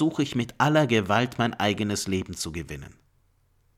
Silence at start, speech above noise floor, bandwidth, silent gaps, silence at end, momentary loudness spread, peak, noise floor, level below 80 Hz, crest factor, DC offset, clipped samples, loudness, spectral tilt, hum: 0 s; 40 dB; 16 kHz; none; 0.9 s; 12 LU; -8 dBFS; -65 dBFS; -52 dBFS; 20 dB; under 0.1%; under 0.1%; -25 LUFS; -5 dB/octave; none